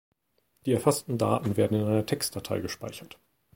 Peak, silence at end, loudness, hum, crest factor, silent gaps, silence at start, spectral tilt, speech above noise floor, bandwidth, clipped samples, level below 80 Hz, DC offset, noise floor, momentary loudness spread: -8 dBFS; 0.5 s; -28 LUFS; none; 22 dB; none; 0.65 s; -5.5 dB/octave; 45 dB; 17 kHz; under 0.1%; -60 dBFS; under 0.1%; -73 dBFS; 12 LU